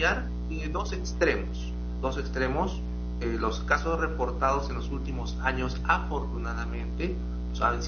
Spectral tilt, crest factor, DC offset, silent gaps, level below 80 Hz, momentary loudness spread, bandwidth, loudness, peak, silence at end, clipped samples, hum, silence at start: -4.5 dB/octave; 20 dB; under 0.1%; none; -32 dBFS; 7 LU; 6.8 kHz; -30 LUFS; -10 dBFS; 0 s; under 0.1%; 60 Hz at -30 dBFS; 0 s